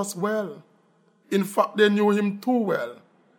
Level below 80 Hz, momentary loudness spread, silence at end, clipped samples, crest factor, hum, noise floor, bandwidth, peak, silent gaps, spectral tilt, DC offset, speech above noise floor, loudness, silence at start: -80 dBFS; 10 LU; 0.45 s; under 0.1%; 18 dB; none; -62 dBFS; 17 kHz; -6 dBFS; none; -5.5 dB/octave; under 0.1%; 39 dB; -23 LUFS; 0 s